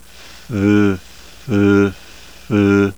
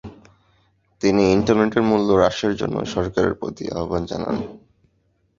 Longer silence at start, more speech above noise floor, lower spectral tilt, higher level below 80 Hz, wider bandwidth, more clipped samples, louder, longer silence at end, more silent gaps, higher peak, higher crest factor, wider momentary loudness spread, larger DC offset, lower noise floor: first, 0.5 s vs 0.05 s; second, 27 dB vs 46 dB; first, -7.5 dB/octave vs -6 dB/octave; about the same, -46 dBFS vs -44 dBFS; first, 18.5 kHz vs 7.6 kHz; neither; first, -16 LUFS vs -20 LUFS; second, 0.05 s vs 0.8 s; neither; about the same, -2 dBFS vs -2 dBFS; second, 14 dB vs 20 dB; first, 14 LU vs 11 LU; first, 0.9% vs under 0.1%; second, -40 dBFS vs -65 dBFS